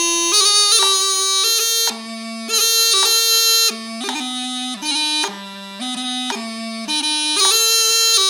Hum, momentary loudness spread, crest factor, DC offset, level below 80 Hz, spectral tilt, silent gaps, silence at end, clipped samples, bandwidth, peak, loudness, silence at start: none; 14 LU; 18 dB; under 0.1%; -82 dBFS; 1.5 dB/octave; none; 0 s; under 0.1%; over 20 kHz; 0 dBFS; -14 LUFS; 0 s